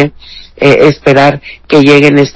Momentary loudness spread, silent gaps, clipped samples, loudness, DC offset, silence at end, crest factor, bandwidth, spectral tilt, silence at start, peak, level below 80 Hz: 8 LU; none; 10%; -6 LUFS; under 0.1%; 0.05 s; 6 dB; 8 kHz; -6.5 dB/octave; 0 s; 0 dBFS; -40 dBFS